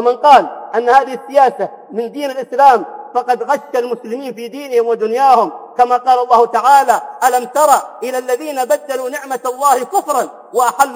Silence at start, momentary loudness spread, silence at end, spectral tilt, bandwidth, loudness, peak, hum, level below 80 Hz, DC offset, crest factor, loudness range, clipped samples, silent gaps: 0 s; 12 LU; 0 s; -2.5 dB/octave; 17.5 kHz; -14 LUFS; 0 dBFS; none; -62 dBFS; under 0.1%; 14 dB; 4 LU; 0.4%; none